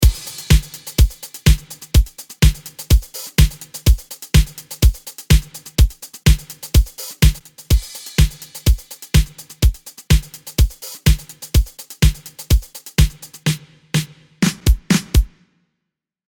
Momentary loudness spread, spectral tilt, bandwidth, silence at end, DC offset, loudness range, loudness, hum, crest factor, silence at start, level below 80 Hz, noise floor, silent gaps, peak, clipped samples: 8 LU; -4.5 dB/octave; 19.5 kHz; 1.05 s; under 0.1%; 2 LU; -19 LUFS; none; 16 dB; 0 s; -18 dBFS; -80 dBFS; none; 0 dBFS; under 0.1%